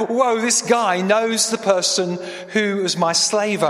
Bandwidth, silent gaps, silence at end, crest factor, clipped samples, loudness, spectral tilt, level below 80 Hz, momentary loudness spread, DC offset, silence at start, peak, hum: 15.5 kHz; none; 0 s; 16 dB; under 0.1%; -18 LUFS; -2.5 dB/octave; -70 dBFS; 5 LU; under 0.1%; 0 s; -2 dBFS; none